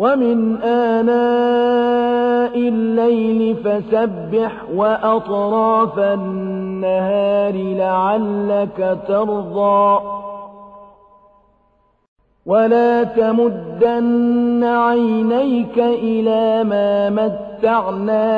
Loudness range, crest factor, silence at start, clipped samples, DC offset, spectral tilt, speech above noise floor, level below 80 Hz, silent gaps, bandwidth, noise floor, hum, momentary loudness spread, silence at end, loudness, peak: 4 LU; 14 dB; 0 s; under 0.1%; under 0.1%; -9 dB/octave; 43 dB; -54 dBFS; 12.08-12.16 s; 5 kHz; -59 dBFS; none; 5 LU; 0 s; -16 LUFS; -2 dBFS